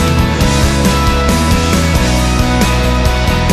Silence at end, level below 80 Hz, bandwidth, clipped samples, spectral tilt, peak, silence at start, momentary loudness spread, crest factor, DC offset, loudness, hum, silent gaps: 0 s; -16 dBFS; 14 kHz; under 0.1%; -5 dB/octave; 0 dBFS; 0 s; 1 LU; 10 dB; under 0.1%; -12 LUFS; none; none